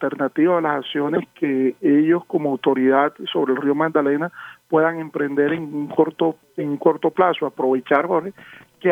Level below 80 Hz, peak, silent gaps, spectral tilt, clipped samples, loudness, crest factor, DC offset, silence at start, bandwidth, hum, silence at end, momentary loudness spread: -74 dBFS; -2 dBFS; none; -8 dB/octave; under 0.1%; -20 LUFS; 18 dB; under 0.1%; 0 s; 3.9 kHz; none; 0 s; 7 LU